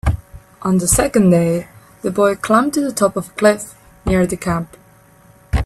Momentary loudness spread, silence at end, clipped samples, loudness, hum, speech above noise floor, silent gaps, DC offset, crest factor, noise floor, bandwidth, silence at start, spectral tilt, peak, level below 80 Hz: 13 LU; 0 s; under 0.1%; -17 LUFS; none; 32 dB; none; under 0.1%; 16 dB; -48 dBFS; 14 kHz; 0.05 s; -5.5 dB/octave; 0 dBFS; -30 dBFS